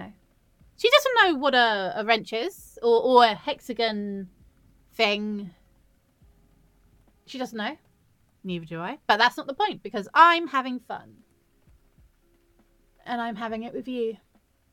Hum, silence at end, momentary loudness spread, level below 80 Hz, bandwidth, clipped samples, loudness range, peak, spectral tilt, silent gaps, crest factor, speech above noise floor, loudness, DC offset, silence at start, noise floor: none; 0.55 s; 19 LU; -64 dBFS; 17.5 kHz; under 0.1%; 15 LU; -4 dBFS; -4 dB/octave; none; 22 dB; 39 dB; -24 LUFS; under 0.1%; 0 s; -64 dBFS